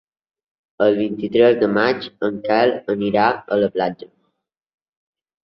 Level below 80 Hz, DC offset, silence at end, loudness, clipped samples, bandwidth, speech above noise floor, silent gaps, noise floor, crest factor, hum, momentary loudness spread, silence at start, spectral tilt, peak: -60 dBFS; under 0.1%; 1.35 s; -18 LUFS; under 0.1%; 6 kHz; 56 dB; none; -74 dBFS; 18 dB; none; 9 LU; 0.8 s; -8 dB/octave; -2 dBFS